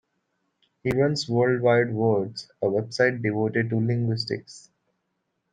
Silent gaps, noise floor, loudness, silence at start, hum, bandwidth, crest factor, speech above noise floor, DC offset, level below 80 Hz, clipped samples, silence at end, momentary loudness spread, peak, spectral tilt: none; -77 dBFS; -24 LUFS; 0.85 s; none; 9.4 kHz; 18 dB; 53 dB; under 0.1%; -64 dBFS; under 0.1%; 0.95 s; 8 LU; -6 dBFS; -6.5 dB/octave